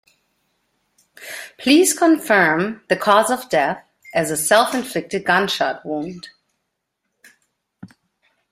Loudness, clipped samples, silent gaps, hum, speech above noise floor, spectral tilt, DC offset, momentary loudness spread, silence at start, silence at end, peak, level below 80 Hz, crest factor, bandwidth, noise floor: -18 LUFS; under 0.1%; none; none; 58 dB; -3 dB/octave; under 0.1%; 17 LU; 1.2 s; 0.65 s; 0 dBFS; -62 dBFS; 20 dB; 16 kHz; -76 dBFS